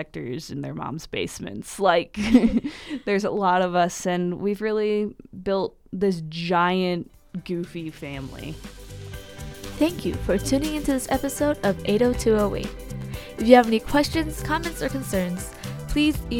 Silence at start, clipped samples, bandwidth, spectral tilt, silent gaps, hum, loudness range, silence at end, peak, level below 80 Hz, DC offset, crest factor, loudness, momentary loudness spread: 0 s; under 0.1%; 18 kHz; -5.5 dB/octave; none; none; 7 LU; 0 s; 0 dBFS; -40 dBFS; under 0.1%; 24 dB; -24 LUFS; 15 LU